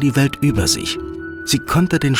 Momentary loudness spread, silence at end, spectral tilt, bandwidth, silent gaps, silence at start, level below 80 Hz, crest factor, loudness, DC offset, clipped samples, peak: 10 LU; 0 s; -4.5 dB/octave; 18.5 kHz; none; 0 s; -38 dBFS; 14 dB; -18 LUFS; under 0.1%; under 0.1%; -4 dBFS